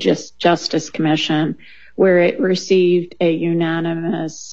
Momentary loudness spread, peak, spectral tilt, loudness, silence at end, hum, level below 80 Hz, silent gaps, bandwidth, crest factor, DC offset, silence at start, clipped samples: 8 LU; -2 dBFS; -5.5 dB/octave; -17 LUFS; 0 s; none; -60 dBFS; none; 7.8 kHz; 16 dB; 0.7%; 0 s; under 0.1%